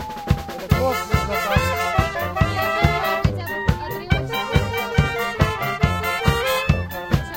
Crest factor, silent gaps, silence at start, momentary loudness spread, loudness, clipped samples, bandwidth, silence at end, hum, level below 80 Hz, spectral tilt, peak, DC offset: 20 dB; none; 0 s; 4 LU; -21 LUFS; under 0.1%; 17 kHz; 0 s; none; -30 dBFS; -5.5 dB/octave; 0 dBFS; under 0.1%